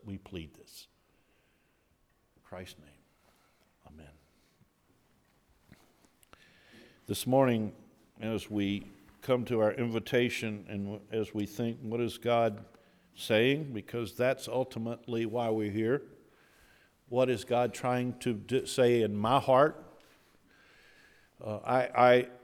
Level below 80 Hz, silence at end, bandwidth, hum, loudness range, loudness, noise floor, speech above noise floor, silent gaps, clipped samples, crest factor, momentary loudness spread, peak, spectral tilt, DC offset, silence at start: -68 dBFS; 0.05 s; 18.5 kHz; none; 5 LU; -31 LUFS; -71 dBFS; 41 dB; none; under 0.1%; 22 dB; 19 LU; -10 dBFS; -6 dB/octave; under 0.1%; 0.05 s